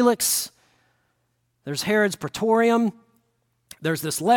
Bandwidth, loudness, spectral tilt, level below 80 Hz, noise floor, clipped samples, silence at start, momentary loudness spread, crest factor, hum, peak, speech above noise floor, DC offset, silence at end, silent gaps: 17.5 kHz; -23 LUFS; -3.5 dB/octave; -64 dBFS; -71 dBFS; under 0.1%; 0 s; 12 LU; 16 dB; none; -6 dBFS; 50 dB; under 0.1%; 0 s; none